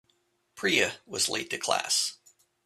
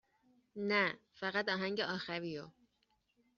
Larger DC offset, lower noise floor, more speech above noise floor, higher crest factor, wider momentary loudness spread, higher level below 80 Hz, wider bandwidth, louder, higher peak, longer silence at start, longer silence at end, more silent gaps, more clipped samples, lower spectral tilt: neither; second, -72 dBFS vs -79 dBFS; about the same, 43 dB vs 41 dB; about the same, 22 dB vs 22 dB; second, 6 LU vs 14 LU; first, -72 dBFS vs -80 dBFS; first, 15.5 kHz vs 7.2 kHz; first, -27 LUFS vs -37 LUFS; first, -10 dBFS vs -18 dBFS; about the same, 0.55 s vs 0.55 s; second, 0.5 s vs 0.9 s; neither; neither; about the same, -1 dB/octave vs -2 dB/octave